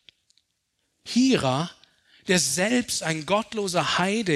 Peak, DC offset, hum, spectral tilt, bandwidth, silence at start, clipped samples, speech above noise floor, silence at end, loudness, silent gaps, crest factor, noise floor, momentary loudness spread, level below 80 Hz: -6 dBFS; under 0.1%; none; -3.5 dB/octave; 13.5 kHz; 1.05 s; under 0.1%; 52 dB; 0 s; -24 LUFS; none; 20 dB; -75 dBFS; 8 LU; -62 dBFS